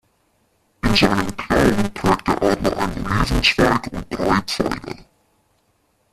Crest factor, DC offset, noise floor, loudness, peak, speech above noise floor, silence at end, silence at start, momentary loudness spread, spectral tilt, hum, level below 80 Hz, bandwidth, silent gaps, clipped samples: 20 dB; under 0.1%; -64 dBFS; -19 LUFS; 0 dBFS; 45 dB; 1.1 s; 0.85 s; 9 LU; -5 dB/octave; none; -32 dBFS; 15 kHz; none; under 0.1%